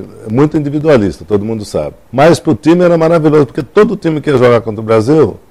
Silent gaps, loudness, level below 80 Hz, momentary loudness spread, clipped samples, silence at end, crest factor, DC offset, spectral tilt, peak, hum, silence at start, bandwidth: none; -11 LUFS; -40 dBFS; 9 LU; under 0.1%; 0.15 s; 10 dB; under 0.1%; -7.5 dB/octave; 0 dBFS; none; 0 s; 13 kHz